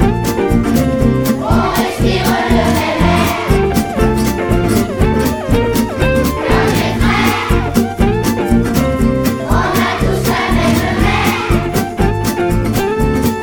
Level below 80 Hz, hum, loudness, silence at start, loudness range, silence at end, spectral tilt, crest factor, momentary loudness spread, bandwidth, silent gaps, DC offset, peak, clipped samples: -22 dBFS; none; -14 LUFS; 0 s; 1 LU; 0 s; -6 dB/octave; 12 dB; 3 LU; over 20 kHz; none; under 0.1%; 0 dBFS; under 0.1%